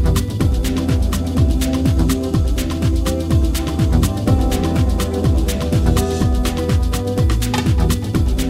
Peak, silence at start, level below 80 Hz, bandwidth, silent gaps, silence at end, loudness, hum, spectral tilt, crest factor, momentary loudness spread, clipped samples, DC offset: -2 dBFS; 0 s; -20 dBFS; 16.5 kHz; none; 0 s; -18 LUFS; none; -6.5 dB/octave; 14 dB; 2 LU; under 0.1%; under 0.1%